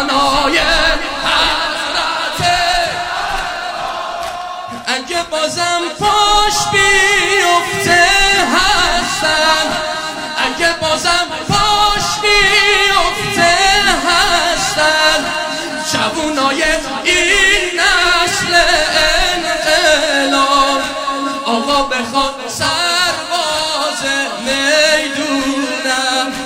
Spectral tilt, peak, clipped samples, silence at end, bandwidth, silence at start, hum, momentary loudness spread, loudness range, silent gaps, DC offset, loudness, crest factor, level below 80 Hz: -1.5 dB/octave; 0 dBFS; under 0.1%; 0 s; 16.5 kHz; 0 s; none; 9 LU; 5 LU; none; under 0.1%; -12 LUFS; 14 dB; -32 dBFS